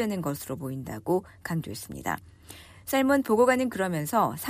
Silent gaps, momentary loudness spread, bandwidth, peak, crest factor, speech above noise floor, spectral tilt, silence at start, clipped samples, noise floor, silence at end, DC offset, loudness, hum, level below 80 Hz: none; 15 LU; 15.5 kHz; -10 dBFS; 16 dB; 22 dB; -5.5 dB/octave; 0 s; under 0.1%; -49 dBFS; 0 s; under 0.1%; -28 LUFS; none; -58 dBFS